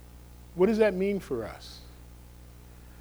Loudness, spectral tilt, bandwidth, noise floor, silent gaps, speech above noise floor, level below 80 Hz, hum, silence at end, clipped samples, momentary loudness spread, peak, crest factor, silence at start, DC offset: -27 LUFS; -7 dB/octave; over 20 kHz; -49 dBFS; none; 22 dB; -50 dBFS; 60 Hz at -50 dBFS; 0.1 s; under 0.1%; 27 LU; -12 dBFS; 20 dB; 0.05 s; under 0.1%